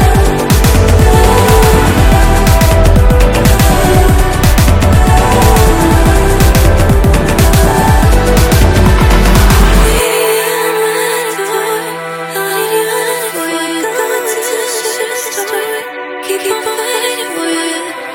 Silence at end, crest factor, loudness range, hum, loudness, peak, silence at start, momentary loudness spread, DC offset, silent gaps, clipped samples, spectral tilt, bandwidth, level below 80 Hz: 0 s; 8 dB; 7 LU; none; -10 LUFS; 0 dBFS; 0 s; 8 LU; under 0.1%; none; 0.6%; -5 dB/octave; 17.5 kHz; -12 dBFS